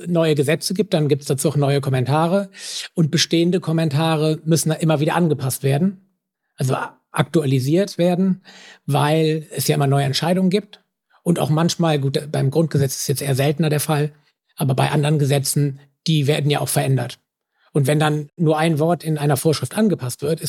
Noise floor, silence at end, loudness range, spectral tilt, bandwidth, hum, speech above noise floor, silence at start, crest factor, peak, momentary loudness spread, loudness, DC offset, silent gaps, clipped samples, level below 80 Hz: -72 dBFS; 0 s; 2 LU; -5.5 dB/octave; 17 kHz; none; 53 dB; 0 s; 16 dB; -4 dBFS; 6 LU; -19 LUFS; under 0.1%; none; under 0.1%; -68 dBFS